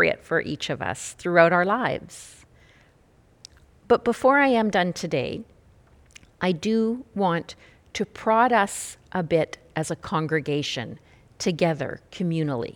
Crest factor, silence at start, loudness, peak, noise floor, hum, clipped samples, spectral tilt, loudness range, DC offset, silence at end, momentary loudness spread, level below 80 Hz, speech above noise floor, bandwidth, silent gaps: 22 dB; 0 s; -24 LUFS; -2 dBFS; -58 dBFS; none; under 0.1%; -5 dB/octave; 3 LU; under 0.1%; 0.05 s; 13 LU; -58 dBFS; 34 dB; 19 kHz; none